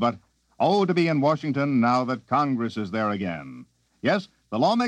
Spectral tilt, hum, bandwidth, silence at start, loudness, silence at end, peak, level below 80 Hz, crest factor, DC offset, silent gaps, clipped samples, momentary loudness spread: -7 dB/octave; none; 9.2 kHz; 0 s; -24 LUFS; 0 s; -8 dBFS; -66 dBFS; 16 dB; under 0.1%; none; under 0.1%; 10 LU